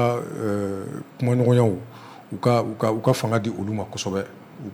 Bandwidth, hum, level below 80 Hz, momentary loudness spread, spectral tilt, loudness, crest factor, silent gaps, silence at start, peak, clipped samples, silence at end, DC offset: 18 kHz; none; -62 dBFS; 17 LU; -7 dB/octave; -23 LUFS; 16 dB; none; 0 s; -8 dBFS; under 0.1%; 0 s; under 0.1%